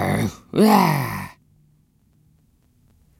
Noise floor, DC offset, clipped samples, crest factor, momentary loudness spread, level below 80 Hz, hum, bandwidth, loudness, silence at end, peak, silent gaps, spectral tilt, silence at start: -60 dBFS; under 0.1%; under 0.1%; 22 dB; 17 LU; -54 dBFS; none; 16.5 kHz; -19 LUFS; 1.9 s; 0 dBFS; none; -6 dB/octave; 0 s